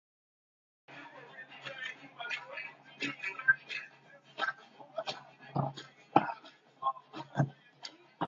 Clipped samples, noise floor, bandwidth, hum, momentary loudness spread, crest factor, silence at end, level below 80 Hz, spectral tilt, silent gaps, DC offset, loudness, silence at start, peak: under 0.1%; -59 dBFS; 7.4 kHz; none; 19 LU; 32 dB; 0 s; -78 dBFS; -3 dB/octave; none; under 0.1%; -36 LUFS; 0.9 s; -6 dBFS